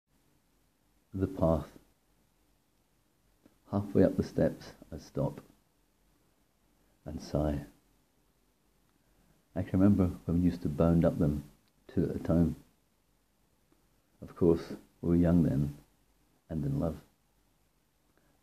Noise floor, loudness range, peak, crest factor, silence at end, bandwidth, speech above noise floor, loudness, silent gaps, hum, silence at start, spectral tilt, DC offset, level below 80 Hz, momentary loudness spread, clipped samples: -73 dBFS; 10 LU; -10 dBFS; 24 dB; 1.45 s; 14.5 kHz; 43 dB; -31 LUFS; none; none; 1.15 s; -9.5 dB/octave; under 0.1%; -52 dBFS; 19 LU; under 0.1%